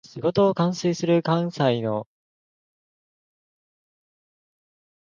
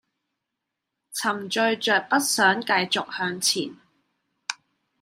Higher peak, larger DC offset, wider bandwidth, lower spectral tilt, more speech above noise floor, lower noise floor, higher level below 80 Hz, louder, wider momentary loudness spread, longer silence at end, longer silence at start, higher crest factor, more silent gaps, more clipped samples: about the same, -6 dBFS vs -6 dBFS; neither; second, 7.4 kHz vs 16 kHz; first, -6.5 dB/octave vs -2 dB/octave; first, over 68 dB vs 60 dB; first, under -90 dBFS vs -83 dBFS; first, -68 dBFS vs -78 dBFS; about the same, -23 LUFS vs -23 LUFS; second, 6 LU vs 15 LU; first, 3.05 s vs 0.45 s; second, 0.15 s vs 1.1 s; about the same, 20 dB vs 22 dB; neither; neither